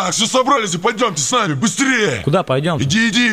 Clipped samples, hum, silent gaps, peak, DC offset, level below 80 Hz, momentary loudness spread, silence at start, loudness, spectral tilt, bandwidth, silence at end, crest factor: under 0.1%; none; none; -2 dBFS; 0.3%; -50 dBFS; 3 LU; 0 s; -15 LUFS; -3.5 dB/octave; 16 kHz; 0 s; 12 dB